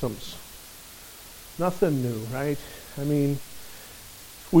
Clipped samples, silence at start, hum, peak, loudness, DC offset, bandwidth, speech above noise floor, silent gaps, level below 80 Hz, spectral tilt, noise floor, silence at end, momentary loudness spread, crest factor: under 0.1%; 0 s; none; -6 dBFS; -28 LUFS; under 0.1%; 17 kHz; 18 dB; none; -52 dBFS; -6.5 dB/octave; -45 dBFS; 0 s; 18 LU; 22 dB